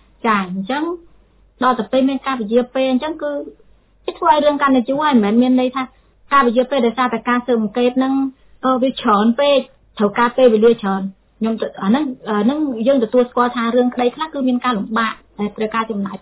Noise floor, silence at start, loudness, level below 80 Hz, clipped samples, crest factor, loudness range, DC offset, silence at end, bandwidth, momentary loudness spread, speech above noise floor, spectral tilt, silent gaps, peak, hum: -50 dBFS; 0.25 s; -17 LUFS; -54 dBFS; under 0.1%; 14 dB; 3 LU; under 0.1%; 0.05 s; 4 kHz; 10 LU; 34 dB; -10 dB/octave; none; -2 dBFS; none